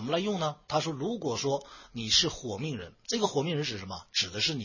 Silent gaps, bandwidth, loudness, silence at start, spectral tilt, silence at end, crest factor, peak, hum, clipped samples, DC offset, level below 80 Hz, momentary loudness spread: none; 7.4 kHz; -30 LUFS; 0 s; -3.5 dB/octave; 0 s; 20 dB; -12 dBFS; none; under 0.1%; under 0.1%; -58 dBFS; 12 LU